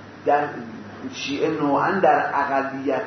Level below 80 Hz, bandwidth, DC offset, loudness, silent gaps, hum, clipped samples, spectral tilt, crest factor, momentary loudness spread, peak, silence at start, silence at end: -68 dBFS; 6.4 kHz; under 0.1%; -22 LUFS; none; none; under 0.1%; -5.5 dB/octave; 16 dB; 16 LU; -6 dBFS; 0 s; 0 s